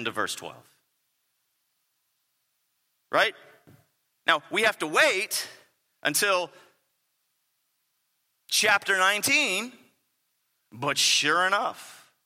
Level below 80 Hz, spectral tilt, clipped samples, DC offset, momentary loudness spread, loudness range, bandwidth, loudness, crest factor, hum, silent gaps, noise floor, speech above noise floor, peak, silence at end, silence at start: -82 dBFS; -1 dB/octave; under 0.1%; under 0.1%; 12 LU; 9 LU; 16.5 kHz; -24 LUFS; 26 dB; none; none; -75 dBFS; 50 dB; -4 dBFS; 0.3 s; 0 s